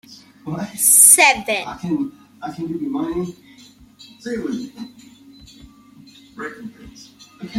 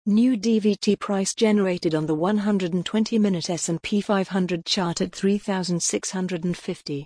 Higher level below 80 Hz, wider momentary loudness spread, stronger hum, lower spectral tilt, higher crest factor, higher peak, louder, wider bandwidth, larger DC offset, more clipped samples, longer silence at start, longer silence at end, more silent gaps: first, -54 dBFS vs -60 dBFS; first, 29 LU vs 6 LU; neither; second, -1.5 dB/octave vs -5 dB/octave; first, 22 dB vs 14 dB; first, 0 dBFS vs -8 dBFS; first, -14 LUFS vs -23 LUFS; first, 16.5 kHz vs 10.5 kHz; neither; neither; about the same, 0.1 s vs 0.05 s; about the same, 0 s vs 0 s; neither